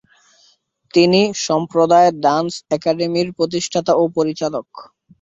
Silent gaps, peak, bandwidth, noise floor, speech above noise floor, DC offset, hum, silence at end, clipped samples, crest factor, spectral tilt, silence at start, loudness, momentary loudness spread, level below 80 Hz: none; 0 dBFS; 7.8 kHz; -57 dBFS; 41 dB; under 0.1%; none; 0.4 s; under 0.1%; 16 dB; -5 dB/octave; 0.95 s; -17 LUFS; 8 LU; -60 dBFS